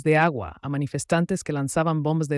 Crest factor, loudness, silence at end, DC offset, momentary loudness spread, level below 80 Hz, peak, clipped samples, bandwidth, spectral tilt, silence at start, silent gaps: 14 dB; -24 LUFS; 0 s; under 0.1%; 8 LU; -54 dBFS; -10 dBFS; under 0.1%; 12 kHz; -6 dB/octave; 0 s; none